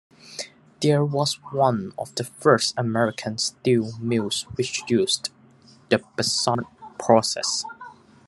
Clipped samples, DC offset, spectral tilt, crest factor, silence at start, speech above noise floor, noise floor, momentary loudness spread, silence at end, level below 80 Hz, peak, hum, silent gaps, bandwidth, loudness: under 0.1%; under 0.1%; -4 dB/octave; 22 dB; 0.25 s; 30 dB; -53 dBFS; 15 LU; 0.35 s; -64 dBFS; -2 dBFS; none; none; 12.5 kHz; -23 LUFS